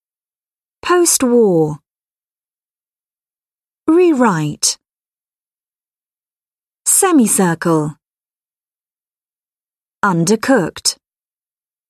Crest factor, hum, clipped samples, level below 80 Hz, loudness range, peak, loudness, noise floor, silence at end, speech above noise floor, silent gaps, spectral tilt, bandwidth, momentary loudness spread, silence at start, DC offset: 18 dB; none; under 0.1%; -58 dBFS; 3 LU; 0 dBFS; -14 LUFS; under -90 dBFS; 0.95 s; over 77 dB; none; -4 dB/octave; 13.5 kHz; 12 LU; 0.85 s; under 0.1%